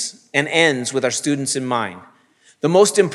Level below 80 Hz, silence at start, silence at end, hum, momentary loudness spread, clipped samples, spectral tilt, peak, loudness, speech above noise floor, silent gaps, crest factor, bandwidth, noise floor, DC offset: -80 dBFS; 0 s; 0 s; none; 9 LU; under 0.1%; -3.5 dB/octave; 0 dBFS; -18 LUFS; 37 dB; none; 18 dB; 13.5 kHz; -55 dBFS; under 0.1%